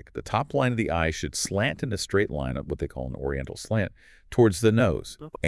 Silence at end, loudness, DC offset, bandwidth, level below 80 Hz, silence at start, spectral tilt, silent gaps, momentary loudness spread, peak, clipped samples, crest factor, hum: 0 s; -26 LUFS; under 0.1%; 12 kHz; -44 dBFS; 0.15 s; -5.5 dB/octave; none; 11 LU; -8 dBFS; under 0.1%; 18 dB; none